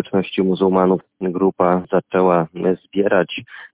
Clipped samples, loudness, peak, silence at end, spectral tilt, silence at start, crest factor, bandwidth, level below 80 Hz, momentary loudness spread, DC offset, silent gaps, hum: under 0.1%; -18 LUFS; -2 dBFS; 0.1 s; -11 dB/octave; 0 s; 16 dB; 4 kHz; -54 dBFS; 6 LU; under 0.1%; none; none